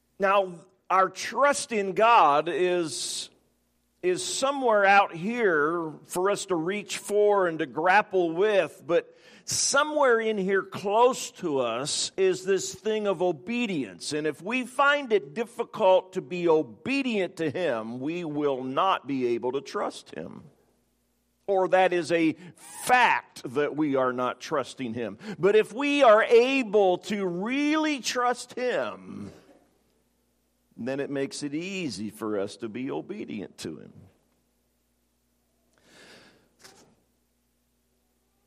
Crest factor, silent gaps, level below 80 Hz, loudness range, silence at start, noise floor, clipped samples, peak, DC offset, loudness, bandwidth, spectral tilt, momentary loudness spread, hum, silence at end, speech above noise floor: 20 dB; none; -76 dBFS; 11 LU; 0.2 s; -72 dBFS; under 0.1%; -6 dBFS; under 0.1%; -25 LUFS; 15 kHz; -3.5 dB/octave; 13 LU; none; 1.8 s; 46 dB